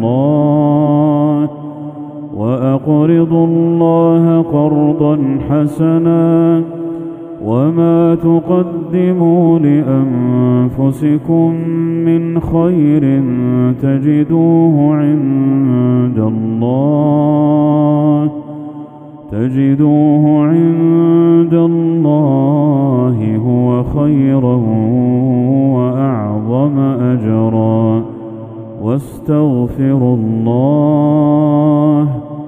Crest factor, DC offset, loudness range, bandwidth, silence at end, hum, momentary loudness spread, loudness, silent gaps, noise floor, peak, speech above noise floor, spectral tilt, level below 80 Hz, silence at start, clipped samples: 12 dB; under 0.1%; 3 LU; 3.7 kHz; 0 s; none; 8 LU; -12 LUFS; none; -31 dBFS; 0 dBFS; 20 dB; -11 dB/octave; -42 dBFS; 0 s; under 0.1%